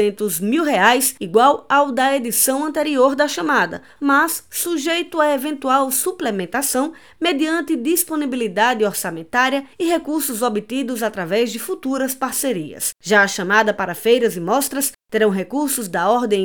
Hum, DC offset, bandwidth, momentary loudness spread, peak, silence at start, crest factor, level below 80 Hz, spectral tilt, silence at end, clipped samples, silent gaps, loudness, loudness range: none; 0.3%; over 20 kHz; 7 LU; 0 dBFS; 0 s; 18 dB; -62 dBFS; -3 dB/octave; 0 s; under 0.1%; none; -18 LUFS; 4 LU